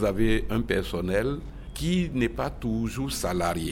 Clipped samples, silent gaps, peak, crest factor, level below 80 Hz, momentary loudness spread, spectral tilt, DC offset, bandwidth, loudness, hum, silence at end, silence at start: under 0.1%; none; -12 dBFS; 16 dB; -36 dBFS; 6 LU; -5.5 dB/octave; under 0.1%; 17 kHz; -28 LUFS; none; 0 s; 0 s